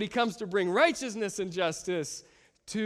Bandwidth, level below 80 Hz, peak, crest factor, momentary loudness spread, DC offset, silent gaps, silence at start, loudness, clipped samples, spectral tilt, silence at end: 14 kHz; -68 dBFS; -10 dBFS; 20 dB; 12 LU; under 0.1%; none; 0 s; -30 LUFS; under 0.1%; -4 dB/octave; 0 s